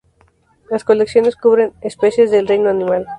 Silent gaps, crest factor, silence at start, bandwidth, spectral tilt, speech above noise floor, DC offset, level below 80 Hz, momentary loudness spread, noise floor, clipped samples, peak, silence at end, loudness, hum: none; 14 dB; 0.7 s; 10.5 kHz; -6 dB/octave; 41 dB; under 0.1%; -54 dBFS; 7 LU; -55 dBFS; under 0.1%; 0 dBFS; 0 s; -15 LUFS; none